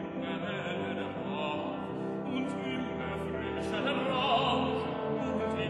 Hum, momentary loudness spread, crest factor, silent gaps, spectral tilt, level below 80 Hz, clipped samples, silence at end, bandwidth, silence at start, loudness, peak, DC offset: none; 8 LU; 16 dB; none; -6.5 dB/octave; -58 dBFS; under 0.1%; 0 s; 11.5 kHz; 0 s; -33 LUFS; -16 dBFS; under 0.1%